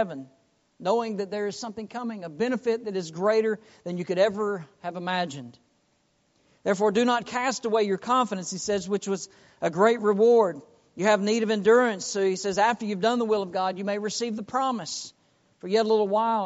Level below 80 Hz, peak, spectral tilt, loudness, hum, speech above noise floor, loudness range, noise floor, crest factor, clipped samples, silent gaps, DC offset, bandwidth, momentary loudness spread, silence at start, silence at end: -70 dBFS; -6 dBFS; -3.5 dB/octave; -26 LUFS; none; 43 dB; 6 LU; -69 dBFS; 20 dB; under 0.1%; none; under 0.1%; 8 kHz; 13 LU; 0 s; 0 s